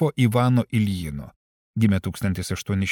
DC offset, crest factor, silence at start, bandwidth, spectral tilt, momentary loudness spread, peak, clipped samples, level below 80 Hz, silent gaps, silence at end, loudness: under 0.1%; 16 dB; 0 s; 18 kHz; -6.5 dB/octave; 12 LU; -8 dBFS; under 0.1%; -46 dBFS; 1.36-1.74 s; 0 s; -23 LUFS